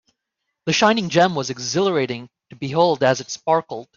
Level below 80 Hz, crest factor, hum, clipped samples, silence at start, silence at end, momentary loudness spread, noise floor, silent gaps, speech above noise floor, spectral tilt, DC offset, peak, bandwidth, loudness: -62 dBFS; 18 dB; none; under 0.1%; 0.65 s; 0.15 s; 10 LU; -79 dBFS; none; 59 dB; -4 dB/octave; under 0.1%; -2 dBFS; 7.6 kHz; -19 LUFS